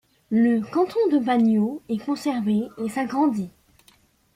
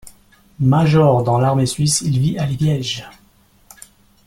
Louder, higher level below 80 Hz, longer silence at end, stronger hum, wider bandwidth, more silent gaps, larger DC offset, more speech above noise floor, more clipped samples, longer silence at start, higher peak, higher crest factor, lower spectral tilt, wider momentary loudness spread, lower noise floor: second, -23 LUFS vs -16 LUFS; second, -64 dBFS vs -46 dBFS; second, 0.85 s vs 1.15 s; neither; about the same, 14 kHz vs 14 kHz; neither; neither; about the same, 37 dB vs 38 dB; neither; first, 0.3 s vs 0.05 s; second, -10 dBFS vs -2 dBFS; about the same, 14 dB vs 16 dB; first, -7 dB/octave vs -5.5 dB/octave; about the same, 9 LU vs 8 LU; first, -59 dBFS vs -53 dBFS